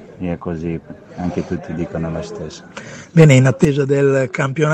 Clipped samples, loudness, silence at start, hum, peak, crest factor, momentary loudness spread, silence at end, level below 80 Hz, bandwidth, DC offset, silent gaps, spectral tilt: under 0.1%; -17 LUFS; 0 s; none; 0 dBFS; 16 dB; 20 LU; 0 s; -44 dBFS; 8.8 kHz; under 0.1%; none; -7 dB/octave